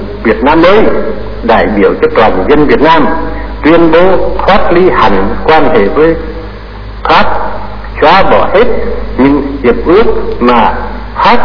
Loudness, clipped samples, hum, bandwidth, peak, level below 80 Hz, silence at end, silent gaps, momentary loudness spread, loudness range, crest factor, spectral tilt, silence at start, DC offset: -7 LUFS; 4%; none; 5.4 kHz; 0 dBFS; -22 dBFS; 0 s; none; 13 LU; 2 LU; 8 dB; -7.5 dB/octave; 0 s; 20%